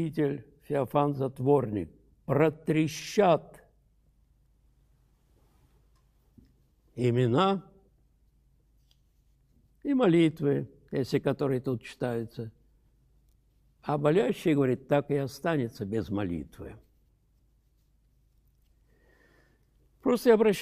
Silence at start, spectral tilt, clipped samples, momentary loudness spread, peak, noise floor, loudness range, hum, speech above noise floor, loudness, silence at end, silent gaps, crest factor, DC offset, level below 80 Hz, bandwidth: 0 s; -7 dB/octave; under 0.1%; 15 LU; -10 dBFS; -67 dBFS; 7 LU; none; 40 dB; -28 LUFS; 0 s; none; 20 dB; under 0.1%; -62 dBFS; 15 kHz